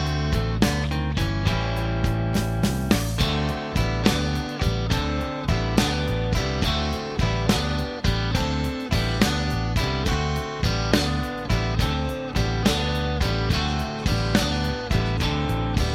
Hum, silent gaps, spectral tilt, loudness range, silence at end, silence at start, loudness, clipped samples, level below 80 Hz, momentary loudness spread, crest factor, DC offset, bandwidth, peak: none; none; -5.5 dB/octave; 1 LU; 0 s; 0 s; -24 LUFS; under 0.1%; -30 dBFS; 4 LU; 22 dB; under 0.1%; 16.5 kHz; -2 dBFS